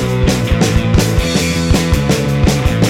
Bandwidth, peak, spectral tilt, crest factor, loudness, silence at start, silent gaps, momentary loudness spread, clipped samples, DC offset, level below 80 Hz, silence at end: 17 kHz; 0 dBFS; -5.5 dB/octave; 12 dB; -13 LUFS; 0 s; none; 1 LU; under 0.1%; under 0.1%; -20 dBFS; 0 s